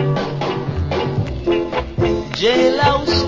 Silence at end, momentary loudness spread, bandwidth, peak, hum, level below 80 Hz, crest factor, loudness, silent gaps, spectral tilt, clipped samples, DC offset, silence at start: 0 s; 7 LU; 7.6 kHz; -2 dBFS; none; -32 dBFS; 16 dB; -18 LUFS; none; -6 dB/octave; under 0.1%; under 0.1%; 0 s